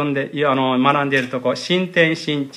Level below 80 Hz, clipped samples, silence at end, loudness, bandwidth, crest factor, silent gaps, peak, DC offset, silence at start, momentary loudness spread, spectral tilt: -68 dBFS; under 0.1%; 0 s; -18 LUFS; 11.5 kHz; 18 dB; none; -2 dBFS; under 0.1%; 0 s; 6 LU; -5.5 dB/octave